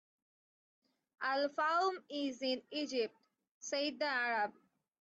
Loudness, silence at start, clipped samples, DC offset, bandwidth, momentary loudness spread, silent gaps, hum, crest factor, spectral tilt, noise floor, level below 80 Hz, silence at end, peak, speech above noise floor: -37 LUFS; 1.2 s; under 0.1%; under 0.1%; 8.2 kHz; 8 LU; 3.51-3.61 s; none; 16 dB; -1.5 dB/octave; under -90 dBFS; -90 dBFS; 0.5 s; -24 dBFS; over 53 dB